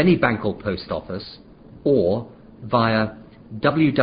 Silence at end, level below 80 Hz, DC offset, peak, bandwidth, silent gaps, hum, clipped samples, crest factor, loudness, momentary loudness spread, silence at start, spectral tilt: 0 s; -48 dBFS; under 0.1%; -2 dBFS; 5.2 kHz; none; none; under 0.1%; 20 dB; -22 LUFS; 18 LU; 0 s; -11.5 dB/octave